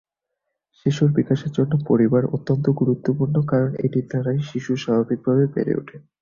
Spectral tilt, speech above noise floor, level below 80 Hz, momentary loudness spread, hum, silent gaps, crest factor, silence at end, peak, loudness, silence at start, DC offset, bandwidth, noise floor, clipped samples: -8.5 dB/octave; 60 dB; -56 dBFS; 6 LU; none; none; 16 dB; 0.2 s; -6 dBFS; -21 LUFS; 0.85 s; under 0.1%; 7.2 kHz; -80 dBFS; under 0.1%